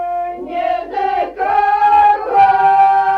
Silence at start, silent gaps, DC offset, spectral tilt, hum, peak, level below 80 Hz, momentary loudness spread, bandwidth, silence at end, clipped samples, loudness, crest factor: 0 s; none; under 0.1%; -5 dB/octave; none; -2 dBFS; -48 dBFS; 10 LU; 5.4 kHz; 0 s; under 0.1%; -13 LUFS; 10 dB